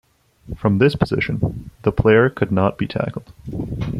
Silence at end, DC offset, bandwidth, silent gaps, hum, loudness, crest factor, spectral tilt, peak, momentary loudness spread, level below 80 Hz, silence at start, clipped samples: 0 s; under 0.1%; 12 kHz; none; none; -19 LUFS; 18 dB; -8.5 dB/octave; -2 dBFS; 14 LU; -38 dBFS; 0.45 s; under 0.1%